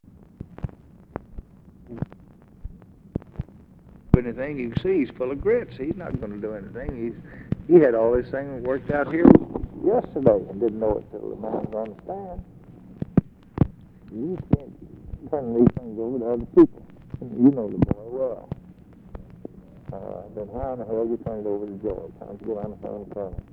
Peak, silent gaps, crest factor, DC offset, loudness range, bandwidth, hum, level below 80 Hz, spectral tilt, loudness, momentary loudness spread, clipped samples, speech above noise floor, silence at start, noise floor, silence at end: 0 dBFS; none; 24 dB; under 0.1%; 11 LU; 4.6 kHz; none; -42 dBFS; -11 dB/octave; -24 LUFS; 23 LU; under 0.1%; 27 dB; 0.5 s; -50 dBFS; 0.1 s